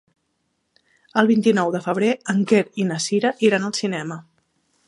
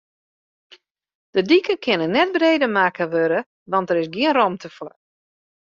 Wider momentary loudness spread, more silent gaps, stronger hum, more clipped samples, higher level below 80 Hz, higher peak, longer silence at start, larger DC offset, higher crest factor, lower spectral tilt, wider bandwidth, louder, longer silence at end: about the same, 8 LU vs 10 LU; second, none vs 3.46-3.66 s; neither; neither; second, -72 dBFS vs -66 dBFS; about the same, -2 dBFS vs -4 dBFS; second, 1.15 s vs 1.35 s; neither; about the same, 20 dB vs 18 dB; about the same, -5 dB/octave vs -6 dB/octave; first, 11.5 kHz vs 7.2 kHz; about the same, -20 LUFS vs -19 LUFS; about the same, 0.65 s vs 0.75 s